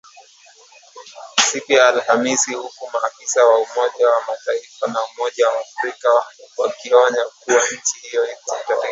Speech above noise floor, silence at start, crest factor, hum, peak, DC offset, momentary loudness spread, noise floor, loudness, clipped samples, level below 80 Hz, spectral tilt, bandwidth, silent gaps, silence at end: 30 dB; 0.15 s; 18 dB; none; 0 dBFS; under 0.1%; 10 LU; -48 dBFS; -18 LUFS; under 0.1%; -76 dBFS; -0.5 dB/octave; 8 kHz; none; 0 s